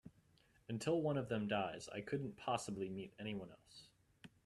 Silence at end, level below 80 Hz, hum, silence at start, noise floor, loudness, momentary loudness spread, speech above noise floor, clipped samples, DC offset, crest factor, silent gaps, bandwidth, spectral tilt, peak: 0.2 s; -74 dBFS; none; 0.05 s; -72 dBFS; -43 LUFS; 20 LU; 30 dB; under 0.1%; under 0.1%; 20 dB; none; 13 kHz; -5.5 dB/octave; -24 dBFS